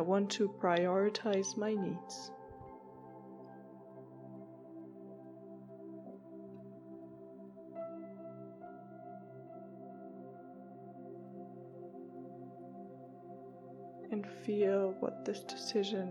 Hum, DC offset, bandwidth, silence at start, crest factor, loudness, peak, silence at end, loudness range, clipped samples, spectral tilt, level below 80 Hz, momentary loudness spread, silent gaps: none; under 0.1%; 12 kHz; 0 s; 22 dB; -37 LUFS; -18 dBFS; 0 s; 15 LU; under 0.1%; -5 dB/octave; -82 dBFS; 20 LU; none